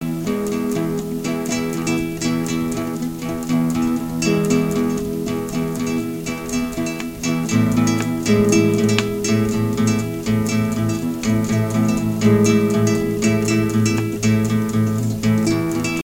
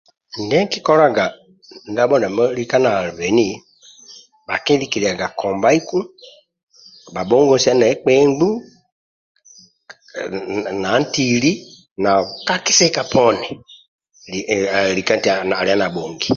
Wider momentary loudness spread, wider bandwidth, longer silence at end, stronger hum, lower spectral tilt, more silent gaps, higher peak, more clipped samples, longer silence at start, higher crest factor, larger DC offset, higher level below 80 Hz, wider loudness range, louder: second, 7 LU vs 14 LU; first, 17 kHz vs 7.6 kHz; about the same, 0 s vs 0 s; neither; first, -5.5 dB/octave vs -3.5 dB/octave; second, none vs 6.63-6.67 s, 8.92-9.35 s, 11.91-11.96 s, 13.88-13.99 s; about the same, 0 dBFS vs 0 dBFS; neither; second, 0 s vs 0.35 s; about the same, 18 dB vs 18 dB; neither; first, -42 dBFS vs -54 dBFS; about the same, 4 LU vs 4 LU; about the same, -19 LUFS vs -17 LUFS